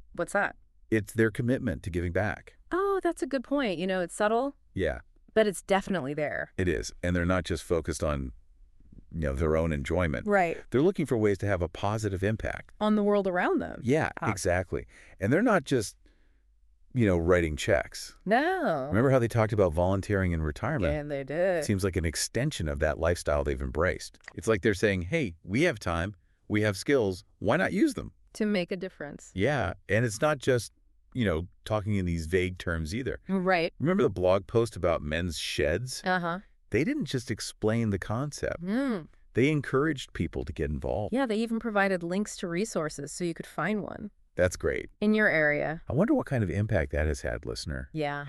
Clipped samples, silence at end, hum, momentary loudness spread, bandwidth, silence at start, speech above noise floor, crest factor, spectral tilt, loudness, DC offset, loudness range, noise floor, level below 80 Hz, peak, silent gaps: under 0.1%; 0 s; none; 8 LU; 13.5 kHz; 0.15 s; 34 dB; 18 dB; -6 dB/octave; -29 LUFS; under 0.1%; 3 LU; -63 dBFS; -44 dBFS; -10 dBFS; none